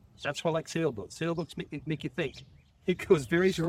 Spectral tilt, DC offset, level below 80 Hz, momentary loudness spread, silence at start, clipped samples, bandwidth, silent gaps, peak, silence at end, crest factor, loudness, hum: -6 dB/octave; under 0.1%; -60 dBFS; 11 LU; 0.2 s; under 0.1%; 14.5 kHz; none; -10 dBFS; 0 s; 22 dB; -31 LUFS; none